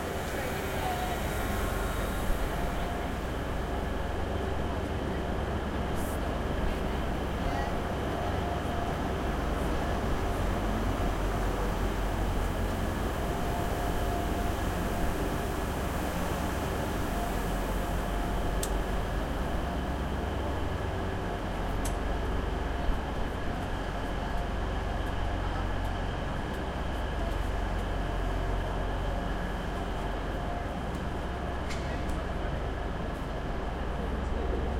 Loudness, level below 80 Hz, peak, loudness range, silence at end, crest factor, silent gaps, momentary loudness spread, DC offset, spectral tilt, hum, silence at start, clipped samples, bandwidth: -33 LUFS; -34 dBFS; -14 dBFS; 3 LU; 0 s; 16 dB; none; 3 LU; under 0.1%; -6 dB/octave; none; 0 s; under 0.1%; 16.5 kHz